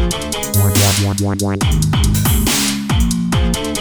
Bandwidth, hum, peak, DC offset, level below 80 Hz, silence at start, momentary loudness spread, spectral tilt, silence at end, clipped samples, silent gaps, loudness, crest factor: over 20 kHz; none; -2 dBFS; under 0.1%; -22 dBFS; 0 s; 5 LU; -4.5 dB/octave; 0 s; under 0.1%; none; -15 LUFS; 14 dB